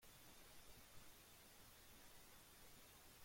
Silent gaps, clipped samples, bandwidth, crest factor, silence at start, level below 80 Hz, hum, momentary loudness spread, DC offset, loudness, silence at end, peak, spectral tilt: none; under 0.1%; 16.5 kHz; 16 dB; 0 s; -74 dBFS; none; 0 LU; under 0.1%; -64 LUFS; 0 s; -48 dBFS; -2 dB/octave